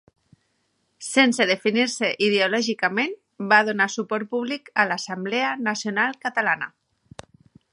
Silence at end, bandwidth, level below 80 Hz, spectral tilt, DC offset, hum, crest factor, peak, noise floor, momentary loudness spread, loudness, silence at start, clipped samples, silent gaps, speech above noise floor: 1.05 s; 11.5 kHz; -70 dBFS; -3 dB/octave; under 0.1%; none; 22 dB; -2 dBFS; -70 dBFS; 9 LU; -22 LUFS; 1 s; under 0.1%; none; 48 dB